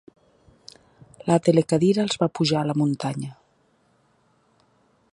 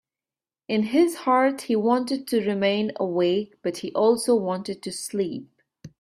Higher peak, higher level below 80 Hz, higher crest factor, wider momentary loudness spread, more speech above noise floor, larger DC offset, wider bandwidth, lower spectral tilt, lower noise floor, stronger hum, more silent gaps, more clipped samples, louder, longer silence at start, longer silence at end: first, -4 dBFS vs -8 dBFS; first, -62 dBFS vs -68 dBFS; first, 22 dB vs 16 dB; first, 13 LU vs 10 LU; second, 43 dB vs over 67 dB; neither; second, 11.5 kHz vs 14.5 kHz; about the same, -6 dB/octave vs -5 dB/octave; second, -64 dBFS vs under -90 dBFS; neither; neither; neither; about the same, -22 LUFS vs -24 LUFS; first, 1.25 s vs 0.7 s; first, 1.8 s vs 0.15 s